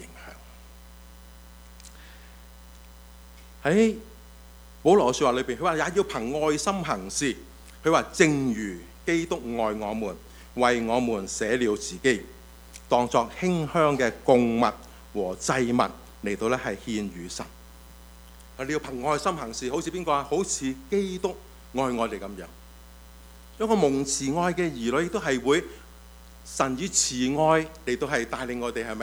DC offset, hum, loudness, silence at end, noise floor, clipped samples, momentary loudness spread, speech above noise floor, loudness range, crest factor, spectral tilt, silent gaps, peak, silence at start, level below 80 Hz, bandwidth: under 0.1%; none; -26 LUFS; 0 s; -48 dBFS; under 0.1%; 16 LU; 22 dB; 6 LU; 24 dB; -4 dB/octave; none; -4 dBFS; 0 s; -48 dBFS; over 20 kHz